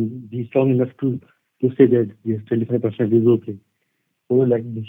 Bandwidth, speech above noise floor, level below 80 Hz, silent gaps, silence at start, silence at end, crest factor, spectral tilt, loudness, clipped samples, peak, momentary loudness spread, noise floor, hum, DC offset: 3.7 kHz; 53 dB; -68 dBFS; none; 0 s; 0 s; 20 dB; -12 dB/octave; -19 LUFS; under 0.1%; 0 dBFS; 12 LU; -72 dBFS; none; under 0.1%